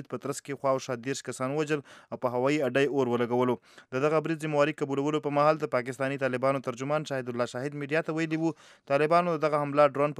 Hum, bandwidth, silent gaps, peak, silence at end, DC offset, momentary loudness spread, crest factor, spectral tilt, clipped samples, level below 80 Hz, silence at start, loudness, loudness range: none; 14 kHz; none; -10 dBFS; 0 s; under 0.1%; 9 LU; 20 dB; -6 dB/octave; under 0.1%; -82 dBFS; 0 s; -28 LUFS; 2 LU